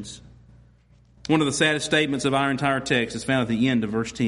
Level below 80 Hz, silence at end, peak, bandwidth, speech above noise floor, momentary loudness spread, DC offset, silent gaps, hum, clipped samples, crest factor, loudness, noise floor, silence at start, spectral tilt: -54 dBFS; 0 s; -6 dBFS; 11.5 kHz; 33 dB; 7 LU; under 0.1%; none; none; under 0.1%; 18 dB; -22 LUFS; -56 dBFS; 0 s; -4.5 dB/octave